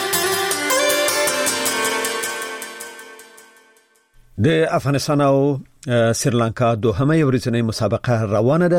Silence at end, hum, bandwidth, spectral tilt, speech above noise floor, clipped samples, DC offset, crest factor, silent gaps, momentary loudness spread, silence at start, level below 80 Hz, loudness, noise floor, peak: 0 s; none; 16.5 kHz; -4.5 dB/octave; 39 dB; under 0.1%; under 0.1%; 14 dB; none; 11 LU; 0 s; -50 dBFS; -18 LUFS; -56 dBFS; -6 dBFS